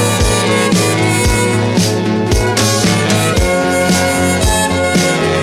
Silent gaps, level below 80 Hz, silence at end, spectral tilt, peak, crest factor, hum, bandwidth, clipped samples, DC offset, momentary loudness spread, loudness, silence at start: none; -24 dBFS; 0 s; -4 dB/octave; 0 dBFS; 12 dB; none; 16 kHz; under 0.1%; under 0.1%; 2 LU; -12 LUFS; 0 s